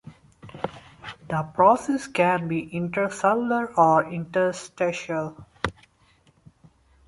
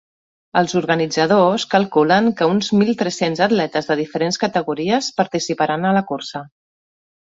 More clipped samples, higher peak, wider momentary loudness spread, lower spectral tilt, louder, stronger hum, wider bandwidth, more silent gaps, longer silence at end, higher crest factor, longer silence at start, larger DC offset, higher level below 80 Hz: neither; about the same, -4 dBFS vs -2 dBFS; first, 16 LU vs 6 LU; about the same, -6 dB/octave vs -5 dB/octave; second, -24 LUFS vs -18 LUFS; neither; first, 11.5 kHz vs 8 kHz; neither; first, 1.35 s vs 0.8 s; about the same, 20 dB vs 16 dB; second, 0.05 s vs 0.55 s; neither; about the same, -56 dBFS vs -60 dBFS